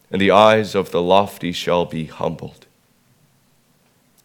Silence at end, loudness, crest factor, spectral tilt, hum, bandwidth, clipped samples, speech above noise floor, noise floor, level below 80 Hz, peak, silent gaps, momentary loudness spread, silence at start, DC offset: 1.75 s; -17 LUFS; 20 dB; -5.5 dB/octave; none; 18.5 kHz; under 0.1%; 42 dB; -59 dBFS; -56 dBFS; 0 dBFS; none; 14 LU; 0.1 s; under 0.1%